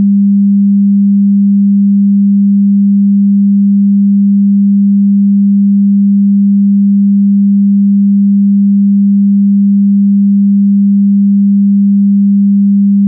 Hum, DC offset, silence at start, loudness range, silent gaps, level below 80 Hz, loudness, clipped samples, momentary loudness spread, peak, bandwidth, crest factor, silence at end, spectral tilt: none; under 0.1%; 0 s; 0 LU; none; -74 dBFS; -8 LUFS; under 0.1%; 0 LU; -4 dBFS; 0.3 kHz; 4 dB; 0 s; -20 dB/octave